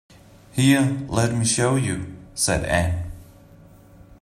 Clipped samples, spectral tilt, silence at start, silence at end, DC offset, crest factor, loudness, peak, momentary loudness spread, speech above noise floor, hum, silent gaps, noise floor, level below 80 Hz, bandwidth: under 0.1%; -4.5 dB/octave; 0.55 s; 0.05 s; under 0.1%; 20 dB; -21 LUFS; -4 dBFS; 13 LU; 28 dB; none; none; -48 dBFS; -42 dBFS; 15 kHz